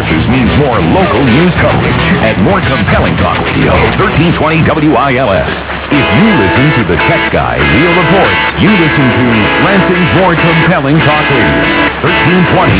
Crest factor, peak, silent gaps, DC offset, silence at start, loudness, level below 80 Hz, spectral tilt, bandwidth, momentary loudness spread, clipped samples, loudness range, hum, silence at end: 8 dB; 0 dBFS; none; 0.5%; 0 s; -8 LUFS; -24 dBFS; -10 dB/octave; 4 kHz; 3 LU; 0.2%; 1 LU; none; 0 s